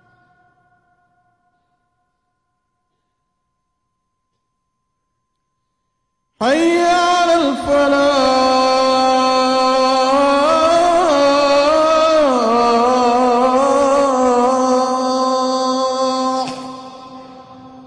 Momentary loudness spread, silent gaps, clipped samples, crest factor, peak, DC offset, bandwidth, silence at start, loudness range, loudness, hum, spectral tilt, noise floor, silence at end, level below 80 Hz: 5 LU; none; under 0.1%; 10 dB; -6 dBFS; under 0.1%; 10.5 kHz; 6.4 s; 6 LU; -14 LUFS; none; -3 dB/octave; -72 dBFS; 0.05 s; -50 dBFS